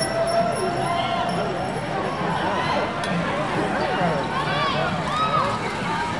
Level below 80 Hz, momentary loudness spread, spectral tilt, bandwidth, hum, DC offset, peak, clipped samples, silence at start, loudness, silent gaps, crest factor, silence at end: -48 dBFS; 4 LU; -5 dB/octave; 11.5 kHz; none; 0.4%; -8 dBFS; under 0.1%; 0 s; -23 LUFS; none; 14 dB; 0 s